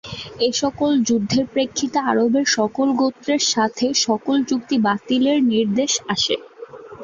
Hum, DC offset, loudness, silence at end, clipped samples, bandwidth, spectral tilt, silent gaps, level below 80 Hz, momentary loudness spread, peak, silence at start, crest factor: none; under 0.1%; -19 LUFS; 0 s; under 0.1%; 7.6 kHz; -3.5 dB/octave; none; -56 dBFS; 4 LU; -4 dBFS; 0.05 s; 16 dB